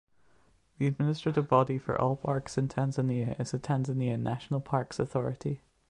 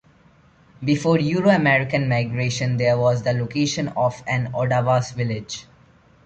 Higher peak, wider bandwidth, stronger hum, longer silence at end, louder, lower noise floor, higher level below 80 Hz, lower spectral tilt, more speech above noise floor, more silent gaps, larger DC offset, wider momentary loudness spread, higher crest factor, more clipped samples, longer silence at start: second, -10 dBFS vs -4 dBFS; first, 10.5 kHz vs 8.6 kHz; neither; second, 0.35 s vs 0.65 s; second, -31 LUFS vs -21 LUFS; first, -66 dBFS vs -54 dBFS; second, -60 dBFS vs -52 dBFS; first, -7.5 dB/octave vs -6 dB/octave; about the same, 36 dB vs 34 dB; neither; neither; about the same, 7 LU vs 9 LU; about the same, 22 dB vs 18 dB; neither; about the same, 0.8 s vs 0.8 s